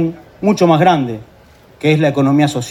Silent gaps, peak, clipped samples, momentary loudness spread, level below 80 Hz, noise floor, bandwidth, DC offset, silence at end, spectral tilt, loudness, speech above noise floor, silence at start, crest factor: none; 0 dBFS; under 0.1%; 10 LU; -50 dBFS; -43 dBFS; 14.5 kHz; under 0.1%; 0 s; -6.5 dB/octave; -14 LUFS; 30 dB; 0 s; 14 dB